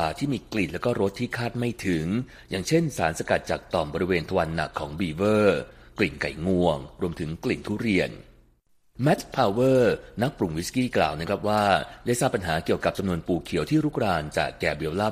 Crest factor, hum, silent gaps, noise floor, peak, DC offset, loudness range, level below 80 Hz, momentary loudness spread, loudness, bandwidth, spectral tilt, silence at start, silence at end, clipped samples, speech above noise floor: 20 dB; none; none; -62 dBFS; -6 dBFS; under 0.1%; 3 LU; -48 dBFS; 8 LU; -26 LUFS; 15 kHz; -5.5 dB/octave; 0 s; 0 s; under 0.1%; 37 dB